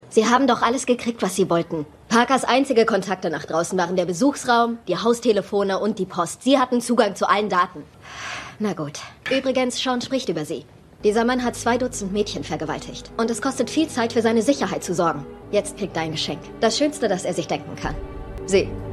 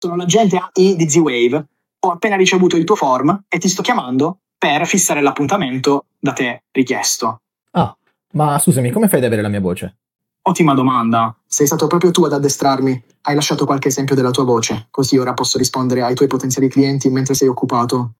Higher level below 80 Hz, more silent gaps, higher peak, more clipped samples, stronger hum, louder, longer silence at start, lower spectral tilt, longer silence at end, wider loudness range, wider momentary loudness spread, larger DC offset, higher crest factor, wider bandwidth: first, -46 dBFS vs -56 dBFS; neither; about the same, -2 dBFS vs 0 dBFS; neither; neither; second, -22 LUFS vs -15 LUFS; about the same, 0.05 s vs 0 s; about the same, -4 dB/octave vs -4.5 dB/octave; about the same, 0 s vs 0.05 s; about the same, 4 LU vs 3 LU; first, 12 LU vs 7 LU; neither; first, 20 dB vs 14 dB; second, 13.5 kHz vs 17 kHz